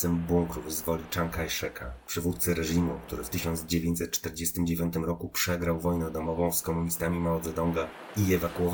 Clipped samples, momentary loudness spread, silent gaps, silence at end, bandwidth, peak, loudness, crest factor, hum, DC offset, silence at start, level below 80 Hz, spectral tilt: under 0.1%; 5 LU; none; 0 s; over 20 kHz; -12 dBFS; -30 LUFS; 16 dB; none; under 0.1%; 0 s; -48 dBFS; -5 dB/octave